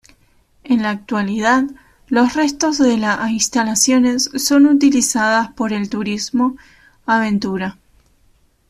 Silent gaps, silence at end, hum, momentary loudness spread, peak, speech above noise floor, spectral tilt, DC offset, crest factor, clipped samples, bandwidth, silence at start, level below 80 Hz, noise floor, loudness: none; 1 s; none; 8 LU; -2 dBFS; 40 dB; -3 dB/octave; under 0.1%; 14 dB; under 0.1%; 14 kHz; 0.65 s; -52 dBFS; -56 dBFS; -16 LUFS